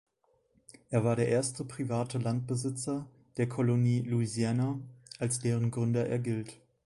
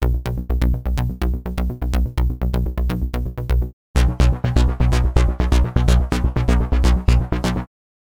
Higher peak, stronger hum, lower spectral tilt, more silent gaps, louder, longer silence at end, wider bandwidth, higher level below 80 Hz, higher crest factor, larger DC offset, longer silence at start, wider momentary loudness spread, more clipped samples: second, -14 dBFS vs -2 dBFS; neither; about the same, -6.5 dB/octave vs -6.5 dB/octave; second, none vs 3.73-3.94 s; second, -32 LUFS vs -20 LUFS; second, 0.3 s vs 0.5 s; second, 11.5 kHz vs 16 kHz; second, -66 dBFS vs -20 dBFS; about the same, 16 dB vs 16 dB; second, under 0.1% vs 0.8%; first, 0.9 s vs 0 s; about the same, 9 LU vs 7 LU; neither